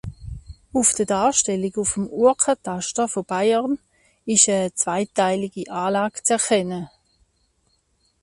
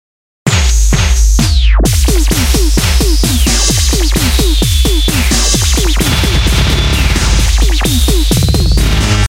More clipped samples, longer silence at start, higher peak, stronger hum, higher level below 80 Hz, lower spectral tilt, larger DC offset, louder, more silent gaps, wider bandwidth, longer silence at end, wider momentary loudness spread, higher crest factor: neither; second, 0.05 s vs 0.45 s; about the same, -2 dBFS vs 0 dBFS; neither; second, -50 dBFS vs -10 dBFS; about the same, -3 dB/octave vs -3.5 dB/octave; neither; second, -20 LUFS vs -11 LUFS; neither; second, 11.5 kHz vs 16.5 kHz; first, 1.35 s vs 0 s; first, 13 LU vs 1 LU; first, 20 dB vs 10 dB